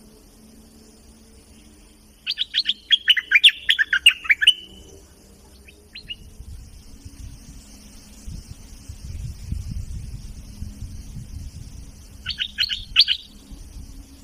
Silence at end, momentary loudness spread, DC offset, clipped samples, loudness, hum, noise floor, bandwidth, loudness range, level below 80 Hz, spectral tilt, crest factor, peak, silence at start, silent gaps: 0.1 s; 27 LU; under 0.1%; under 0.1%; -17 LUFS; none; -50 dBFS; 15.5 kHz; 24 LU; -40 dBFS; -1 dB/octave; 22 dB; -2 dBFS; 2.25 s; none